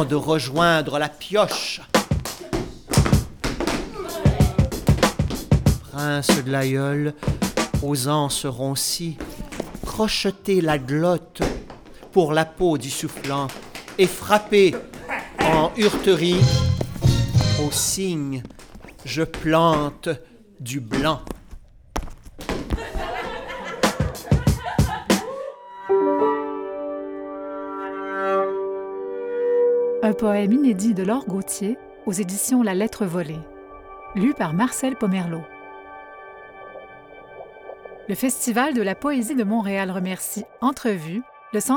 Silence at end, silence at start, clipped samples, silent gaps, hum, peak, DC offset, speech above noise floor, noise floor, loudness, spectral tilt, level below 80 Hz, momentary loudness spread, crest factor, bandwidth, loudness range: 0 s; 0 s; under 0.1%; none; none; -2 dBFS; under 0.1%; 21 dB; -43 dBFS; -22 LUFS; -5 dB/octave; -36 dBFS; 16 LU; 20 dB; over 20 kHz; 6 LU